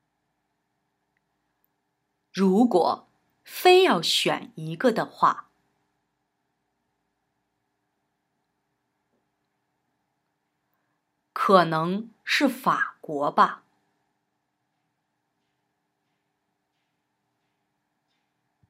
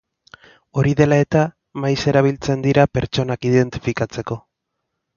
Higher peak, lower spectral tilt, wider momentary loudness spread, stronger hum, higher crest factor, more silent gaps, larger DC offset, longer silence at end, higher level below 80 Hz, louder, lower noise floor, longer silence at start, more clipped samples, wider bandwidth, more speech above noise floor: about the same, -2 dBFS vs 0 dBFS; second, -4.5 dB/octave vs -7 dB/octave; first, 16 LU vs 10 LU; neither; first, 26 dB vs 18 dB; neither; neither; first, 5.15 s vs 0.8 s; second, -86 dBFS vs -44 dBFS; second, -22 LUFS vs -18 LUFS; about the same, -78 dBFS vs -77 dBFS; first, 2.35 s vs 0.75 s; neither; first, 16 kHz vs 7.2 kHz; about the same, 56 dB vs 59 dB